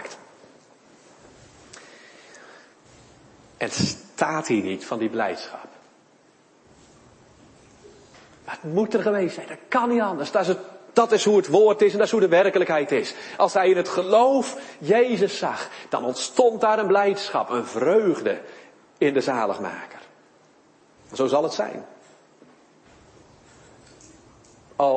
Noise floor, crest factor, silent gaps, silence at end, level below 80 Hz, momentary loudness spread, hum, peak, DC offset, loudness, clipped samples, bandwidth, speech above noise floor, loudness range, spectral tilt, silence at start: -57 dBFS; 22 dB; none; 0 s; -66 dBFS; 15 LU; none; -2 dBFS; under 0.1%; -22 LUFS; under 0.1%; 8.8 kHz; 36 dB; 13 LU; -4.5 dB/octave; 0 s